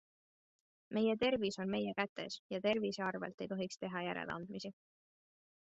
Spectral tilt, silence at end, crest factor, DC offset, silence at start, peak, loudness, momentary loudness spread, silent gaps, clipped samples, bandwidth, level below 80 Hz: -3.5 dB/octave; 1 s; 20 dB; under 0.1%; 0.9 s; -20 dBFS; -39 LUFS; 10 LU; 2.09-2.16 s, 2.39-2.50 s, 3.34-3.38 s; under 0.1%; 8 kHz; -76 dBFS